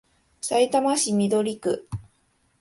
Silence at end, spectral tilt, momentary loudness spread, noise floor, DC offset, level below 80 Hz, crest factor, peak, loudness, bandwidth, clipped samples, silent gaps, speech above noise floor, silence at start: 0.6 s; -4.5 dB/octave; 14 LU; -66 dBFS; under 0.1%; -56 dBFS; 16 dB; -8 dBFS; -23 LUFS; 12 kHz; under 0.1%; none; 44 dB; 0.45 s